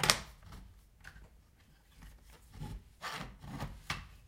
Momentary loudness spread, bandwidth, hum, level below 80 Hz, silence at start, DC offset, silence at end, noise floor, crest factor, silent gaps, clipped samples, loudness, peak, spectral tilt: 19 LU; 16 kHz; none; -54 dBFS; 0 s; under 0.1%; 0 s; -64 dBFS; 40 dB; none; under 0.1%; -41 LUFS; -2 dBFS; -2 dB/octave